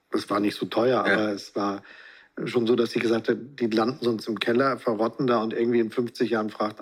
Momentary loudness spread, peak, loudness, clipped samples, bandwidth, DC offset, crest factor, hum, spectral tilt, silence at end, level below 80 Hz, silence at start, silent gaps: 6 LU; -8 dBFS; -25 LUFS; under 0.1%; 14.5 kHz; under 0.1%; 18 dB; none; -6 dB/octave; 0 s; -76 dBFS; 0.1 s; none